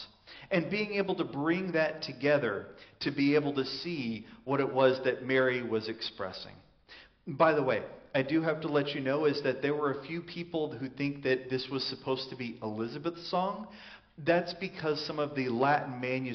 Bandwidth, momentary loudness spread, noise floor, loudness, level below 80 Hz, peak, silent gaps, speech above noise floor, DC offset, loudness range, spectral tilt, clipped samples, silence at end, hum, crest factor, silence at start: 6.4 kHz; 12 LU; -56 dBFS; -31 LUFS; -68 dBFS; -12 dBFS; none; 25 dB; under 0.1%; 4 LU; -4 dB/octave; under 0.1%; 0 s; none; 20 dB; 0 s